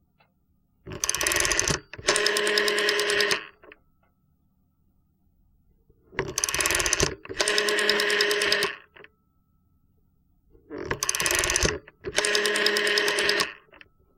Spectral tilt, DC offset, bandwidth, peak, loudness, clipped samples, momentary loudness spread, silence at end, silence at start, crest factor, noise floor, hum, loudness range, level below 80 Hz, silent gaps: -1 dB/octave; under 0.1%; 17 kHz; -4 dBFS; -23 LUFS; under 0.1%; 9 LU; 0.65 s; 0.85 s; 24 dB; -68 dBFS; none; 6 LU; -48 dBFS; none